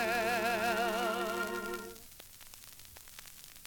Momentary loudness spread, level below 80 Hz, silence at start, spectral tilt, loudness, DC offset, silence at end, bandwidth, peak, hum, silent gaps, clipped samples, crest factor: 19 LU; -62 dBFS; 0 s; -3 dB/octave; -33 LUFS; under 0.1%; 0 s; 18 kHz; -20 dBFS; none; none; under 0.1%; 16 dB